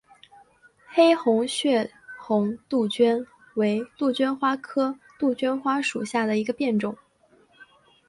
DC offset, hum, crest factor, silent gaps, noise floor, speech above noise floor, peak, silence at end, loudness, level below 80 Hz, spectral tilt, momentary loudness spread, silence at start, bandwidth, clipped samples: under 0.1%; none; 18 dB; none; -60 dBFS; 37 dB; -6 dBFS; 1.15 s; -24 LUFS; -70 dBFS; -5 dB/octave; 8 LU; 0.9 s; 11.5 kHz; under 0.1%